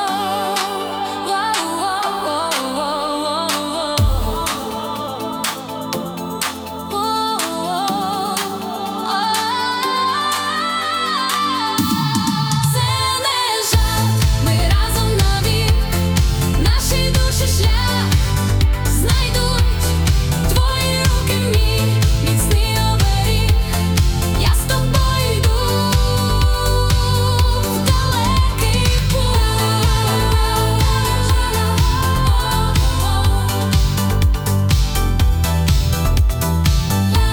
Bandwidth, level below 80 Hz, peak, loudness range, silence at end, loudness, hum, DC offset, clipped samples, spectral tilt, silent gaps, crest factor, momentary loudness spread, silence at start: over 20 kHz; -20 dBFS; 0 dBFS; 4 LU; 0 s; -17 LUFS; none; under 0.1%; under 0.1%; -4.5 dB/octave; none; 16 dB; 5 LU; 0 s